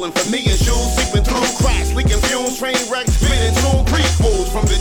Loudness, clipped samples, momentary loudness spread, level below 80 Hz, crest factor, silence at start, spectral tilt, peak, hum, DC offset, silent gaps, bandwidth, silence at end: -16 LUFS; under 0.1%; 3 LU; -18 dBFS; 12 dB; 0 s; -4 dB/octave; -2 dBFS; none; under 0.1%; none; 18.5 kHz; 0 s